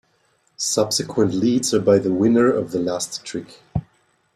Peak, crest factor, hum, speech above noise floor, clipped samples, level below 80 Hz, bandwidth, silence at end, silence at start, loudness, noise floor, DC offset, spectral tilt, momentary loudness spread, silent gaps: -4 dBFS; 18 dB; none; 44 dB; under 0.1%; -50 dBFS; 15.5 kHz; 0.55 s; 0.6 s; -20 LUFS; -63 dBFS; under 0.1%; -4.5 dB/octave; 13 LU; none